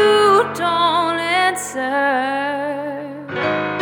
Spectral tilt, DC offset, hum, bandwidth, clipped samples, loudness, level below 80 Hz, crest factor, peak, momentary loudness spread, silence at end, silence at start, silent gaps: -3.5 dB/octave; under 0.1%; none; 18 kHz; under 0.1%; -18 LUFS; -64 dBFS; 14 dB; -4 dBFS; 11 LU; 0 s; 0 s; none